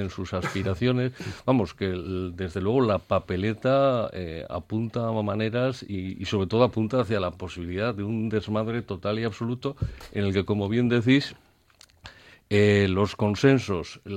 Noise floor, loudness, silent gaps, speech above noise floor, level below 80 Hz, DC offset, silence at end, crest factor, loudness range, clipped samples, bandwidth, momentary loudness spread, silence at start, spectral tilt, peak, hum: -57 dBFS; -26 LUFS; none; 32 dB; -50 dBFS; under 0.1%; 0 s; 20 dB; 3 LU; under 0.1%; 11 kHz; 11 LU; 0 s; -7 dB/octave; -6 dBFS; none